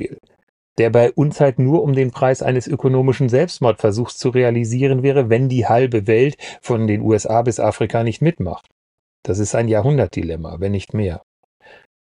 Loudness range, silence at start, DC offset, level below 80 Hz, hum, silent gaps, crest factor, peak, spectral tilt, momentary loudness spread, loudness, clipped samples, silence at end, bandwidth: 4 LU; 0 s; under 0.1%; -50 dBFS; none; 0.43-0.76 s, 8.71-9.23 s; 16 dB; -2 dBFS; -7 dB/octave; 10 LU; -17 LUFS; under 0.1%; 0.85 s; 10.5 kHz